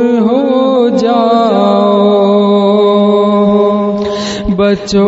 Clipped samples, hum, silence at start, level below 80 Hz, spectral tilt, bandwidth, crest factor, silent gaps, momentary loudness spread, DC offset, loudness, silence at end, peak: under 0.1%; none; 0 s; -36 dBFS; -7 dB/octave; 8 kHz; 8 dB; none; 5 LU; under 0.1%; -10 LUFS; 0 s; 0 dBFS